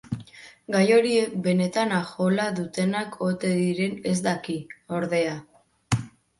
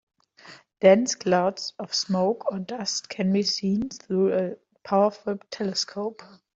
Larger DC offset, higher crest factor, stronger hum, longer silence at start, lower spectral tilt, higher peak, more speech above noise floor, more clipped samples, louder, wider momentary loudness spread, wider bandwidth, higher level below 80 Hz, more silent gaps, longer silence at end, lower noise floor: neither; about the same, 18 dB vs 20 dB; neither; second, 0.1 s vs 0.45 s; about the same, -5.5 dB/octave vs -4.5 dB/octave; about the same, -6 dBFS vs -4 dBFS; second, 22 dB vs 26 dB; neither; about the same, -25 LUFS vs -25 LUFS; about the same, 14 LU vs 12 LU; first, 11.5 kHz vs 7.8 kHz; first, -58 dBFS vs -66 dBFS; neither; about the same, 0.3 s vs 0.3 s; second, -46 dBFS vs -50 dBFS